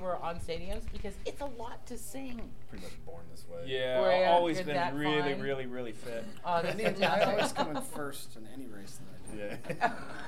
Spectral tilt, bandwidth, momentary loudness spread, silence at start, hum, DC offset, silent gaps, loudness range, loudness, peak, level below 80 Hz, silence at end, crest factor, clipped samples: -4.5 dB/octave; 16 kHz; 20 LU; 0 s; none; 1%; none; 11 LU; -33 LUFS; -14 dBFS; -50 dBFS; 0 s; 20 dB; under 0.1%